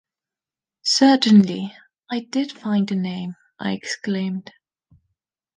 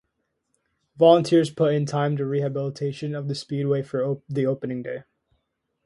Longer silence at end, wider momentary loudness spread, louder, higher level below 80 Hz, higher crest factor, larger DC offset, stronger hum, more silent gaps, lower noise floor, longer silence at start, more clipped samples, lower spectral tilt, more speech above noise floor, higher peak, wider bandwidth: first, 1.15 s vs 0.85 s; first, 16 LU vs 13 LU; first, -20 LUFS vs -23 LUFS; about the same, -68 dBFS vs -66 dBFS; about the same, 18 dB vs 20 dB; neither; neither; neither; first, under -90 dBFS vs -76 dBFS; about the same, 0.85 s vs 0.95 s; neither; second, -5 dB/octave vs -7 dB/octave; first, over 71 dB vs 54 dB; about the same, -4 dBFS vs -4 dBFS; second, 9.6 kHz vs 11.5 kHz